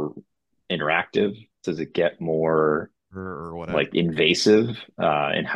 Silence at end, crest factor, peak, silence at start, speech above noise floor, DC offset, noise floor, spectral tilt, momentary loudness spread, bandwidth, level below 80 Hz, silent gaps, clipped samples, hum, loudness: 0 s; 20 dB; -4 dBFS; 0 s; 36 dB; under 0.1%; -58 dBFS; -5 dB/octave; 15 LU; 11.5 kHz; -58 dBFS; none; under 0.1%; none; -23 LUFS